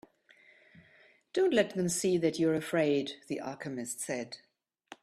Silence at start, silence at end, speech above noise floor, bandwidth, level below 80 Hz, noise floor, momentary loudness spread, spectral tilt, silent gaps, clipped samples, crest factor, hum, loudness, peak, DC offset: 1.35 s; 0.1 s; 32 dB; 14 kHz; -74 dBFS; -63 dBFS; 11 LU; -4.5 dB/octave; none; under 0.1%; 20 dB; none; -31 LUFS; -12 dBFS; under 0.1%